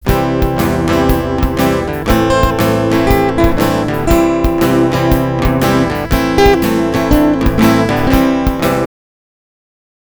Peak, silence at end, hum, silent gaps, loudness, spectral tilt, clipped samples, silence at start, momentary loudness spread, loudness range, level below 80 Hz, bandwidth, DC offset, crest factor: 0 dBFS; 1.15 s; none; none; -12 LUFS; -6 dB/octave; under 0.1%; 0 s; 4 LU; 1 LU; -22 dBFS; over 20 kHz; 0.5%; 12 dB